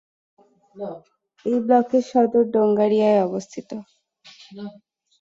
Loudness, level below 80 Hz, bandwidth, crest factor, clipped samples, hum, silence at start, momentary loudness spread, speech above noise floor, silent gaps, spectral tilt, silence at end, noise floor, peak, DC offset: -19 LUFS; -68 dBFS; 7.8 kHz; 18 dB; under 0.1%; none; 0.75 s; 20 LU; 29 dB; none; -7 dB/octave; 0.5 s; -49 dBFS; -6 dBFS; under 0.1%